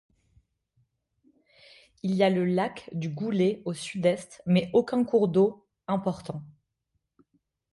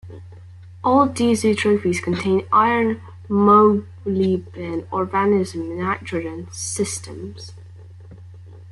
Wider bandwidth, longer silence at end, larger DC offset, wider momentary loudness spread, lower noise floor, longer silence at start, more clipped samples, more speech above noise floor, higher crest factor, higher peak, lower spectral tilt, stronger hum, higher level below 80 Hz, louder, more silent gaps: about the same, 11.5 kHz vs 12 kHz; first, 1.25 s vs 0 s; neither; second, 12 LU vs 16 LU; first, -79 dBFS vs -40 dBFS; first, 2.05 s vs 0.05 s; neither; first, 53 dB vs 21 dB; about the same, 18 dB vs 18 dB; second, -10 dBFS vs -2 dBFS; first, -7 dB/octave vs -5.5 dB/octave; neither; second, -66 dBFS vs -56 dBFS; second, -27 LUFS vs -19 LUFS; neither